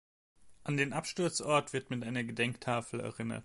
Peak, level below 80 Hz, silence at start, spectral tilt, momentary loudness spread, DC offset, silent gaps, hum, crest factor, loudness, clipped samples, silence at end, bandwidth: -16 dBFS; -68 dBFS; 0.45 s; -4.5 dB/octave; 8 LU; under 0.1%; none; none; 20 dB; -34 LUFS; under 0.1%; 0 s; 11.5 kHz